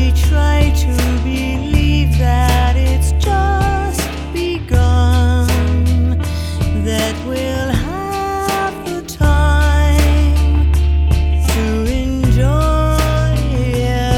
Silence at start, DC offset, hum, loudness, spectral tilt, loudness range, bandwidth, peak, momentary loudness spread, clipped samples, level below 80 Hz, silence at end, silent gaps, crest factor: 0 s; under 0.1%; none; -15 LUFS; -6 dB/octave; 3 LU; 15.5 kHz; 0 dBFS; 7 LU; under 0.1%; -16 dBFS; 0 s; none; 14 dB